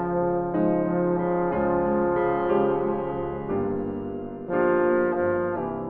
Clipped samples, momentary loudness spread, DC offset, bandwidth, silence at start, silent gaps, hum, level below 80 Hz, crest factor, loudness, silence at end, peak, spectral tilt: under 0.1%; 7 LU; under 0.1%; 3.5 kHz; 0 s; none; none; -50 dBFS; 12 dB; -25 LUFS; 0 s; -12 dBFS; -11.5 dB/octave